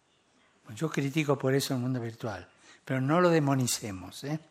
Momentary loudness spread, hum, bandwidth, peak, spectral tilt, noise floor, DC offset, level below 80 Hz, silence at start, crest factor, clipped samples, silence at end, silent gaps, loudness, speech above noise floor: 15 LU; none; 16 kHz; -10 dBFS; -5.5 dB/octave; -67 dBFS; under 0.1%; -76 dBFS; 0.65 s; 20 dB; under 0.1%; 0.1 s; none; -29 LUFS; 38 dB